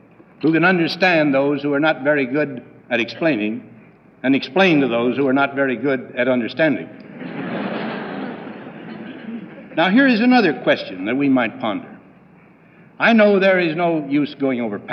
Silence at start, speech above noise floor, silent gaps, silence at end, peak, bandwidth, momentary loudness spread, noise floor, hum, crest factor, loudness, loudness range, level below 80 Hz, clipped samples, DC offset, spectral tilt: 0.4 s; 31 dB; none; 0 s; -2 dBFS; 6.6 kHz; 18 LU; -48 dBFS; none; 16 dB; -18 LUFS; 5 LU; -70 dBFS; under 0.1%; under 0.1%; -7 dB/octave